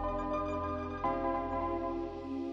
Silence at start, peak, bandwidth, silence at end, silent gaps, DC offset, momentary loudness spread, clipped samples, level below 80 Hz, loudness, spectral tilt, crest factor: 0 s; -22 dBFS; 7.4 kHz; 0 s; none; under 0.1%; 5 LU; under 0.1%; -48 dBFS; -36 LUFS; -8 dB/octave; 14 dB